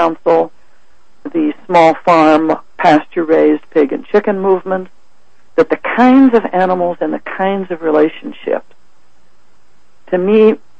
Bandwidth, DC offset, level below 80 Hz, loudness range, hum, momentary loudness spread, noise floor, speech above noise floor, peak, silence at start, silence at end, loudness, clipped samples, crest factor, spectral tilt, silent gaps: 8.4 kHz; 2%; -52 dBFS; 6 LU; none; 11 LU; -56 dBFS; 44 dB; 0 dBFS; 0 s; 0.25 s; -13 LUFS; under 0.1%; 14 dB; -7 dB/octave; none